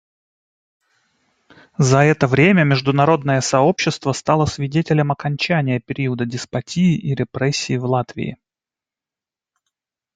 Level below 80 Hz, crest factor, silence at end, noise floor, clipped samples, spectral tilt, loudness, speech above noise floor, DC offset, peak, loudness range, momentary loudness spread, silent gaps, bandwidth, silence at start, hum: -52 dBFS; 18 dB; 1.8 s; -89 dBFS; under 0.1%; -5.5 dB/octave; -18 LUFS; 72 dB; under 0.1%; -2 dBFS; 6 LU; 10 LU; none; 9.2 kHz; 1.8 s; none